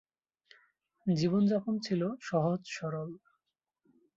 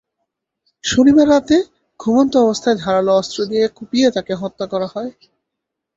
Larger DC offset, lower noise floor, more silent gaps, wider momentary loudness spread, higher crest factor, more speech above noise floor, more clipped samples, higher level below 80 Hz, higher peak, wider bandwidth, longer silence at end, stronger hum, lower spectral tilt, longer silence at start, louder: neither; first, -85 dBFS vs -79 dBFS; neither; about the same, 12 LU vs 13 LU; about the same, 16 dB vs 14 dB; second, 54 dB vs 64 dB; neither; second, -72 dBFS vs -50 dBFS; second, -18 dBFS vs -2 dBFS; about the same, 7.6 kHz vs 8 kHz; first, 1 s vs 0.85 s; neither; first, -7 dB/octave vs -5 dB/octave; first, 1.05 s vs 0.85 s; second, -32 LUFS vs -16 LUFS